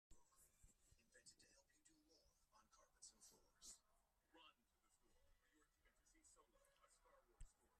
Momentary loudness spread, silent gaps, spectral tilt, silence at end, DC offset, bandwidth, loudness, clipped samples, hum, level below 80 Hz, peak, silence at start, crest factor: 5 LU; none; -1.5 dB/octave; 0 s; under 0.1%; 13 kHz; -66 LUFS; under 0.1%; none; -78 dBFS; -50 dBFS; 0.1 s; 22 dB